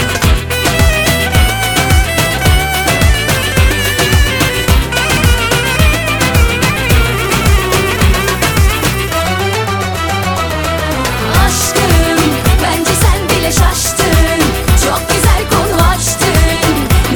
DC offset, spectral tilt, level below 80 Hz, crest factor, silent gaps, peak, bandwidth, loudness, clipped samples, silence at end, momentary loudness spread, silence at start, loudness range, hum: under 0.1%; -4 dB/octave; -16 dBFS; 10 dB; none; 0 dBFS; 19.5 kHz; -11 LUFS; under 0.1%; 0 s; 4 LU; 0 s; 2 LU; none